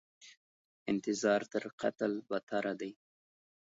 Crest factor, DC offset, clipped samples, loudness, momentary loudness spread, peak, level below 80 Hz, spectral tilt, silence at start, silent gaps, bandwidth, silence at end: 20 dB; under 0.1%; under 0.1%; -36 LUFS; 11 LU; -16 dBFS; -80 dBFS; -4 dB/octave; 0.2 s; 0.37-0.86 s, 1.73-1.78 s, 2.43-2.47 s; 7.6 kHz; 0.75 s